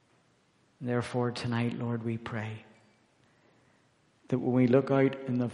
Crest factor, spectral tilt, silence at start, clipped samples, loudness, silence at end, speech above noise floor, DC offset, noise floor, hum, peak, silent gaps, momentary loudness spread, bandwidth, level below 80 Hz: 20 dB; -8 dB/octave; 0.8 s; under 0.1%; -30 LUFS; 0 s; 39 dB; under 0.1%; -68 dBFS; none; -12 dBFS; none; 13 LU; 10.5 kHz; -70 dBFS